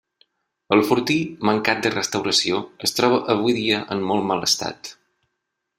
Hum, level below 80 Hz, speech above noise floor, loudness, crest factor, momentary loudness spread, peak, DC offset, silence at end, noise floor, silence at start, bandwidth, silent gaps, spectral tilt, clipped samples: none; -62 dBFS; 58 dB; -20 LUFS; 20 dB; 5 LU; -2 dBFS; under 0.1%; 0.85 s; -78 dBFS; 0.7 s; 16 kHz; none; -3.5 dB/octave; under 0.1%